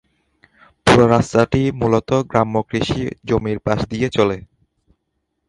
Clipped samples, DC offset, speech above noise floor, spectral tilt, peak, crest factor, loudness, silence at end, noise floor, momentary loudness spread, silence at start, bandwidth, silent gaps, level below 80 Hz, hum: under 0.1%; under 0.1%; 55 dB; -6.5 dB/octave; 0 dBFS; 18 dB; -17 LUFS; 1.1 s; -73 dBFS; 8 LU; 0.85 s; 11.5 kHz; none; -40 dBFS; none